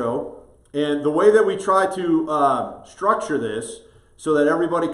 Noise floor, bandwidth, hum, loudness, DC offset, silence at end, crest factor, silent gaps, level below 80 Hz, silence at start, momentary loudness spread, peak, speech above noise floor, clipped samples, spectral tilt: -39 dBFS; 11.5 kHz; none; -20 LUFS; under 0.1%; 0 s; 18 dB; none; -58 dBFS; 0 s; 15 LU; -4 dBFS; 20 dB; under 0.1%; -5.5 dB/octave